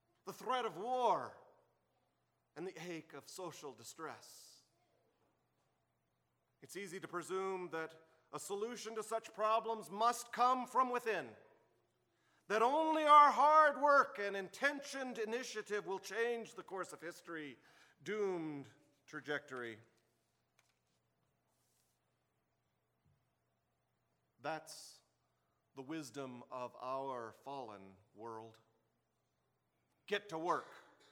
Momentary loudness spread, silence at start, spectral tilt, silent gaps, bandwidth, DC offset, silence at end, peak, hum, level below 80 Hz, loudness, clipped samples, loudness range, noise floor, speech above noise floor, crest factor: 21 LU; 0.25 s; -3.5 dB/octave; none; 18 kHz; under 0.1%; 0.3 s; -16 dBFS; none; under -90 dBFS; -37 LUFS; under 0.1%; 22 LU; -84 dBFS; 46 dB; 24 dB